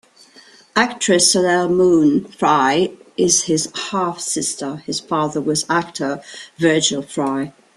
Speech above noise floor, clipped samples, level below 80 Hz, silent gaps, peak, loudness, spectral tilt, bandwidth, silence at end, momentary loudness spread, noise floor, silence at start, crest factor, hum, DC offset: 30 dB; under 0.1%; -58 dBFS; none; -2 dBFS; -17 LUFS; -3 dB/octave; 13 kHz; 0.25 s; 11 LU; -47 dBFS; 0.75 s; 18 dB; none; under 0.1%